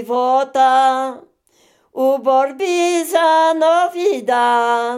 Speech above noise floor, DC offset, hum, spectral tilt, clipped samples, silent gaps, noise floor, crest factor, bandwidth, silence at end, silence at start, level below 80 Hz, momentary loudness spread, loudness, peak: 41 dB; under 0.1%; none; -2 dB/octave; under 0.1%; none; -56 dBFS; 14 dB; 16 kHz; 0 s; 0 s; -76 dBFS; 6 LU; -15 LUFS; -2 dBFS